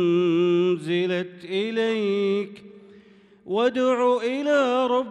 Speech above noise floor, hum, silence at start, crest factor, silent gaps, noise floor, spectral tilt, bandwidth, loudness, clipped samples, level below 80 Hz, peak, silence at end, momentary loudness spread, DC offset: 29 dB; none; 0 s; 12 dB; none; -52 dBFS; -6.5 dB/octave; 9.6 kHz; -23 LUFS; under 0.1%; -74 dBFS; -10 dBFS; 0 s; 8 LU; under 0.1%